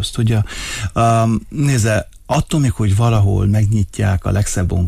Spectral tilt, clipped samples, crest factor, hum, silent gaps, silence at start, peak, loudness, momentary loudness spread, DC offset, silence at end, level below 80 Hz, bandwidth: -6 dB/octave; under 0.1%; 10 dB; none; none; 0 s; -4 dBFS; -16 LUFS; 6 LU; under 0.1%; 0 s; -30 dBFS; 15 kHz